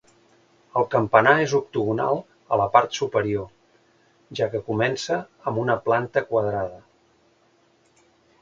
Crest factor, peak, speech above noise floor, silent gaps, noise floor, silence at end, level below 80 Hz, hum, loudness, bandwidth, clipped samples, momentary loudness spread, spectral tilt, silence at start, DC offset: 24 dB; 0 dBFS; 39 dB; none; -61 dBFS; 1.6 s; -58 dBFS; none; -23 LUFS; 7.8 kHz; under 0.1%; 11 LU; -5.5 dB/octave; 0.75 s; under 0.1%